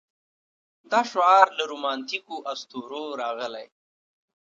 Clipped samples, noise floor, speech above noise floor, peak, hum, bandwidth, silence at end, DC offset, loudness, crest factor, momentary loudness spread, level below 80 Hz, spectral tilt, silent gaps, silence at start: under 0.1%; under -90 dBFS; over 66 dB; -2 dBFS; none; 7.8 kHz; 0.75 s; under 0.1%; -24 LUFS; 24 dB; 17 LU; -88 dBFS; -2 dB/octave; none; 0.9 s